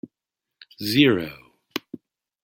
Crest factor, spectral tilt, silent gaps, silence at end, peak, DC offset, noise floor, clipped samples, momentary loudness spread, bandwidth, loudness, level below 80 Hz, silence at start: 24 dB; -5.5 dB/octave; none; 0.5 s; -2 dBFS; under 0.1%; -86 dBFS; under 0.1%; 23 LU; 16.5 kHz; -22 LUFS; -62 dBFS; 0.8 s